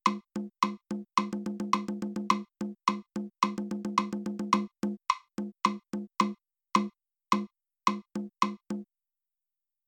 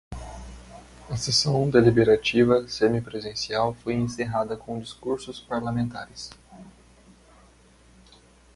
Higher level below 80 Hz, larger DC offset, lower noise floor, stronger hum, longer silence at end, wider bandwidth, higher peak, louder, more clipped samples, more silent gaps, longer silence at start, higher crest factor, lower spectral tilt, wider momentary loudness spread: second, -72 dBFS vs -50 dBFS; neither; first, under -90 dBFS vs -55 dBFS; neither; second, 1.05 s vs 1.85 s; first, 15.5 kHz vs 11.5 kHz; second, -10 dBFS vs -4 dBFS; second, -32 LUFS vs -24 LUFS; neither; neither; about the same, 0.05 s vs 0.1 s; about the same, 22 dB vs 22 dB; about the same, -4.5 dB/octave vs -5 dB/octave; second, 9 LU vs 21 LU